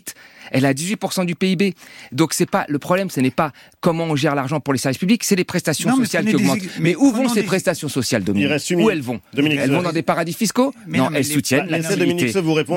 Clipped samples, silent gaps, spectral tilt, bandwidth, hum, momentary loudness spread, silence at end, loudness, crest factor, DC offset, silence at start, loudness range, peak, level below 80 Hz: under 0.1%; none; -5 dB/octave; 16.5 kHz; none; 5 LU; 0 s; -19 LUFS; 16 dB; under 0.1%; 0.05 s; 2 LU; -2 dBFS; -58 dBFS